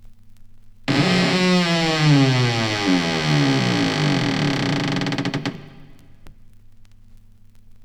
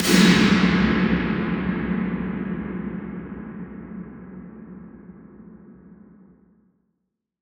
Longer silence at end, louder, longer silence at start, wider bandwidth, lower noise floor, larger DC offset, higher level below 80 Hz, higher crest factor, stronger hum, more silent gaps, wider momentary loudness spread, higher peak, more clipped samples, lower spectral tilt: second, 0 s vs 1.7 s; about the same, -19 LUFS vs -21 LUFS; about the same, 0 s vs 0 s; second, 13 kHz vs over 20 kHz; second, -45 dBFS vs -78 dBFS; neither; second, -48 dBFS vs -42 dBFS; about the same, 18 dB vs 22 dB; neither; neither; second, 8 LU vs 25 LU; about the same, -4 dBFS vs -2 dBFS; neither; about the same, -5.5 dB/octave vs -5 dB/octave